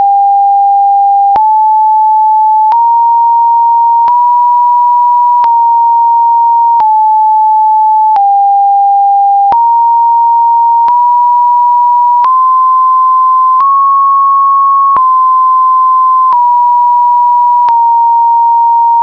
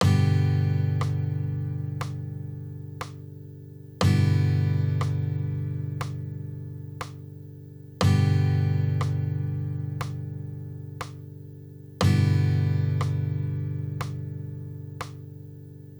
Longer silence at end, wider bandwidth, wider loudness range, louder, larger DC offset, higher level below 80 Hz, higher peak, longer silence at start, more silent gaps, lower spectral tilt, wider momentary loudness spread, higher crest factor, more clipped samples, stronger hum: about the same, 0 s vs 0 s; second, 5.4 kHz vs over 20 kHz; second, 0 LU vs 5 LU; first, -6 LUFS vs -27 LUFS; first, 0.4% vs under 0.1%; about the same, -58 dBFS vs -54 dBFS; first, -4 dBFS vs -8 dBFS; about the same, 0 s vs 0 s; neither; second, -4.5 dB/octave vs -7 dB/octave; second, 1 LU vs 20 LU; second, 2 dB vs 18 dB; neither; second, 60 Hz at -75 dBFS vs 50 Hz at -50 dBFS